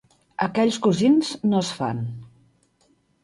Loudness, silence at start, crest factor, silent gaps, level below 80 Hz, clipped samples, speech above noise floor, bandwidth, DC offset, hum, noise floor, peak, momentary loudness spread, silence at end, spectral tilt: -22 LUFS; 0.4 s; 18 dB; none; -62 dBFS; under 0.1%; 43 dB; 11.5 kHz; under 0.1%; none; -64 dBFS; -6 dBFS; 15 LU; 0.95 s; -6 dB/octave